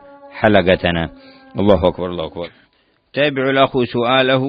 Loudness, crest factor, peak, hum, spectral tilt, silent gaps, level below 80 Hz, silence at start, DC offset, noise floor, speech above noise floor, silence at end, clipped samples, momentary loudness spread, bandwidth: -16 LUFS; 16 dB; 0 dBFS; none; -8.5 dB/octave; none; -42 dBFS; 0.25 s; under 0.1%; -59 dBFS; 43 dB; 0 s; under 0.1%; 15 LU; 5.2 kHz